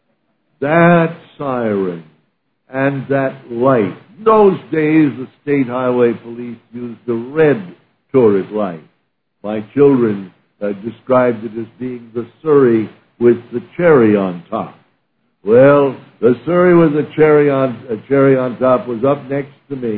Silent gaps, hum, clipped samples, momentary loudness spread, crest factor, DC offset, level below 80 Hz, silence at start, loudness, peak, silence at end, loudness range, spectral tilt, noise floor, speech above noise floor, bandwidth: none; none; under 0.1%; 16 LU; 14 dB; under 0.1%; -56 dBFS; 0.6 s; -14 LUFS; 0 dBFS; 0 s; 5 LU; -12 dB/octave; -67 dBFS; 53 dB; 4.4 kHz